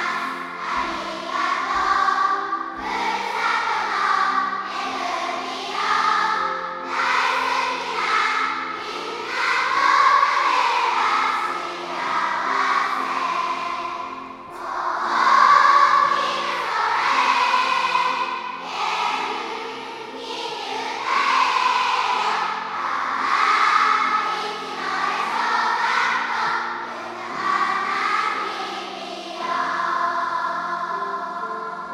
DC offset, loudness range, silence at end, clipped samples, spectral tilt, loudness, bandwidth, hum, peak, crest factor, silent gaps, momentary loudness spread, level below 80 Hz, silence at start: under 0.1%; 6 LU; 0 s; under 0.1%; -1.5 dB/octave; -21 LUFS; 14 kHz; none; -2 dBFS; 20 dB; none; 11 LU; -62 dBFS; 0 s